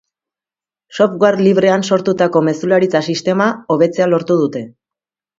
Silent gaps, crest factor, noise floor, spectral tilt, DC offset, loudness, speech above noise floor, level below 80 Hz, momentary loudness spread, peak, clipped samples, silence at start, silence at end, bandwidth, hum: none; 14 dB; under -90 dBFS; -6 dB/octave; under 0.1%; -14 LUFS; over 76 dB; -62 dBFS; 5 LU; 0 dBFS; under 0.1%; 0.95 s; 0.7 s; 7.8 kHz; none